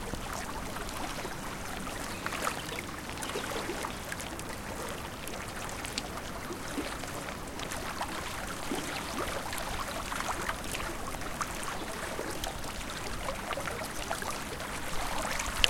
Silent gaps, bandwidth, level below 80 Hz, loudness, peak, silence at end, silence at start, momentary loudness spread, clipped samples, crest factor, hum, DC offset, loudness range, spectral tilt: none; 17 kHz; -46 dBFS; -36 LUFS; -2 dBFS; 0 s; 0 s; 5 LU; under 0.1%; 34 dB; none; under 0.1%; 2 LU; -3 dB/octave